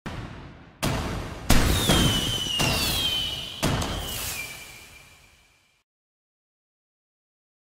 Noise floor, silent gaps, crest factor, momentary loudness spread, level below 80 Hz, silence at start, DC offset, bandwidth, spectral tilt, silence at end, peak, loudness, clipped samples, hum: -61 dBFS; none; 24 dB; 19 LU; -34 dBFS; 0.05 s; under 0.1%; 16.5 kHz; -3.5 dB/octave; 2.8 s; -4 dBFS; -24 LUFS; under 0.1%; none